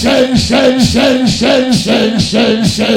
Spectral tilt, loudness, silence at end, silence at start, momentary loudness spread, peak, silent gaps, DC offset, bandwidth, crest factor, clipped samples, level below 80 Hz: -4.5 dB/octave; -10 LUFS; 0 s; 0 s; 2 LU; 0 dBFS; none; under 0.1%; 16 kHz; 10 dB; 0.6%; -32 dBFS